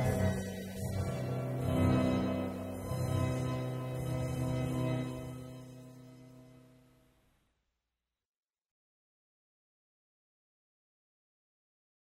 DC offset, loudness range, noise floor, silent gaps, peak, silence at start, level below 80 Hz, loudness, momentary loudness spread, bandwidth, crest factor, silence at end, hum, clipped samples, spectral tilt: under 0.1%; 13 LU; -90 dBFS; none; -18 dBFS; 0 s; -54 dBFS; -35 LUFS; 20 LU; 16 kHz; 18 dB; 5.5 s; none; under 0.1%; -7 dB/octave